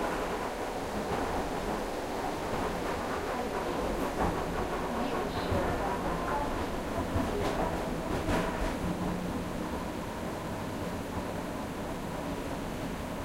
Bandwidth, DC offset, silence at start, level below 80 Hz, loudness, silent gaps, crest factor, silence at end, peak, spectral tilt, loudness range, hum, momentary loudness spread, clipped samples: 16 kHz; under 0.1%; 0 s; -44 dBFS; -34 LUFS; none; 16 dB; 0 s; -16 dBFS; -5.5 dB/octave; 4 LU; none; 5 LU; under 0.1%